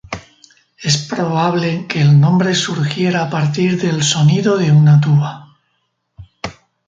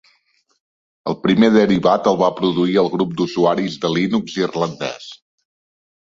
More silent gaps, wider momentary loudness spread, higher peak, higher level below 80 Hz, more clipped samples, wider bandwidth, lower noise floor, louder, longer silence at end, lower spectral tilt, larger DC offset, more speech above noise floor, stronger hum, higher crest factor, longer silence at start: neither; first, 18 LU vs 14 LU; about the same, -2 dBFS vs -2 dBFS; about the same, -50 dBFS vs -54 dBFS; neither; first, 9 kHz vs 7.6 kHz; first, -67 dBFS vs -62 dBFS; first, -14 LUFS vs -17 LUFS; second, 0.35 s vs 0.9 s; about the same, -5.5 dB/octave vs -6.5 dB/octave; neither; first, 54 dB vs 46 dB; neither; about the same, 14 dB vs 16 dB; second, 0.1 s vs 1.05 s